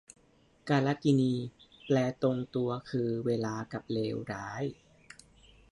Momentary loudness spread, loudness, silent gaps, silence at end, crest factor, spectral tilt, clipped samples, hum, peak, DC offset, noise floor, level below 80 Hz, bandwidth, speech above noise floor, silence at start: 11 LU; -32 LUFS; none; 1 s; 18 dB; -7 dB/octave; under 0.1%; none; -14 dBFS; under 0.1%; -65 dBFS; -66 dBFS; 11.5 kHz; 34 dB; 0.65 s